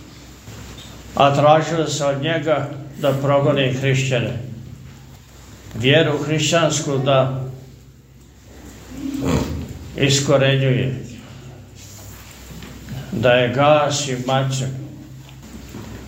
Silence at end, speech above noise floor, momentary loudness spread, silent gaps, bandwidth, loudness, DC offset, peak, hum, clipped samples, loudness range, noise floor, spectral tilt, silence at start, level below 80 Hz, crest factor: 0 s; 28 dB; 23 LU; none; 16 kHz; -18 LUFS; under 0.1%; 0 dBFS; none; under 0.1%; 4 LU; -45 dBFS; -5 dB/octave; 0 s; -44 dBFS; 20 dB